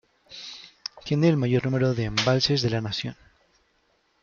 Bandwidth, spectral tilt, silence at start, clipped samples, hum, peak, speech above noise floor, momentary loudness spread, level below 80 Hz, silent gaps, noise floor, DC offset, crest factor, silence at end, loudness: 7.4 kHz; -6 dB/octave; 0.3 s; under 0.1%; none; -6 dBFS; 44 dB; 17 LU; -52 dBFS; none; -68 dBFS; under 0.1%; 20 dB; 1.1 s; -24 LUFS